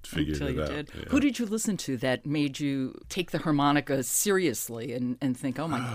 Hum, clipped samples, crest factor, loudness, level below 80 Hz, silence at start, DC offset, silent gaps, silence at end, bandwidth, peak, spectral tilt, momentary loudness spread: none; under 0.1%; 16 dB; -28 LUFS; -48 dBFS; 0 s; under 0.1%; none; 0 s; 16 kHz; -12 dBFS; -4.5 dB/octave; 9 LU